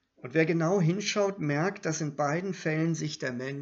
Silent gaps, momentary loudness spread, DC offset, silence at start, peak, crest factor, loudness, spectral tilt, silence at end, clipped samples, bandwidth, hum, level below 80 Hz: none; 6 LU; under 0.1%; 0.25 s; -12 dBFS; 18 dB; -29 LUFS; -5.5 dB/octave; 0 s; under 0.1%; 7.8 kHz; none; -74 dBFS